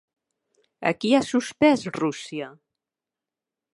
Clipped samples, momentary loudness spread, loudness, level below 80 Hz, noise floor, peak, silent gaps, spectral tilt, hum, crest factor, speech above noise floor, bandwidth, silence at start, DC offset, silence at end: under 0.1%; 14 LU; -23 LUFS; -66 dBFS; -89 dBFS; -6 dBFS; none; -5 dB/octave; none; 20 dB; 66 dB; 11.5 kHz; 0.8 s; under 0.1%; 1.25 s